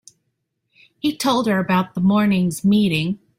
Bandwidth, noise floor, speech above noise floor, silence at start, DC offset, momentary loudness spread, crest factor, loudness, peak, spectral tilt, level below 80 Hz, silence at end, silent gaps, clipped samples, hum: 16 kHz; -74 dBFS; 56 dB; 1.05 s; under 0.1%; 5 LU; 12 dB; -19 LUFS; -6 dBFS; -6 dB/octave; -54 dBFS; 0.2 s; none; under 0.1%; none